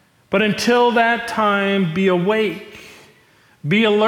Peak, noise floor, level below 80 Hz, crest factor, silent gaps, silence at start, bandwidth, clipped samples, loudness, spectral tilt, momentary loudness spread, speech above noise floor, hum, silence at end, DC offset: -6 dBFS; -53 dBFS; -58 dBFS; 12 dB; none; 0.3 s; 16.5 kHz; under 0.1%; -17 LUFS; -5.5 dB/octave; 9 LU; 37 dB; none; 0 s; under 0.1%